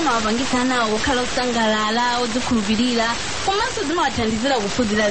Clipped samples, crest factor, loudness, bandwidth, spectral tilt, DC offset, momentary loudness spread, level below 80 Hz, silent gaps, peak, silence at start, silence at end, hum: under 0.1%; 12 dB; -20 LUFS; 8.8 kHz; -3 dB/octave; 2%; 2 LU; -40 dBFS; none; -8 dBFS; 0 s; 0 s; none